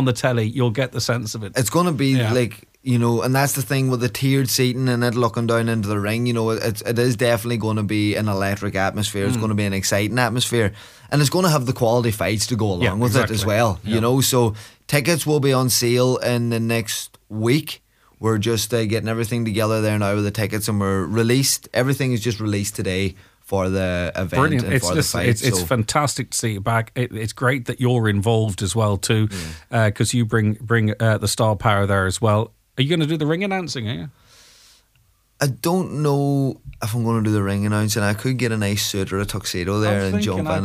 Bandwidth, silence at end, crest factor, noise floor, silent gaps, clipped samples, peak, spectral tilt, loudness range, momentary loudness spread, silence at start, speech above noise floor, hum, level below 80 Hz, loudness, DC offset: 16 kHz; 0 s; 18 dB; -60 dBFS; none; under 0.1%; -2 dBFS; -5 dB/octave; 3 LU; 6 LU; 0 s; 40 dB; none; -48 dBFS; -20 LUFS; under 0.1%